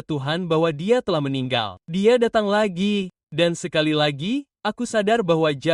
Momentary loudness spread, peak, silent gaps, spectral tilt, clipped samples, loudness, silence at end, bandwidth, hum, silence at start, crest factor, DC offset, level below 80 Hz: 7 LU; -6 dBFS; 3.23-3.27 s; -5.5 dB/octave; under 0.1%; -21 LUFS; 0 s; 11.5 kHz; none; 0.1 s; 16 dB; under 0.1%; -58 dBFS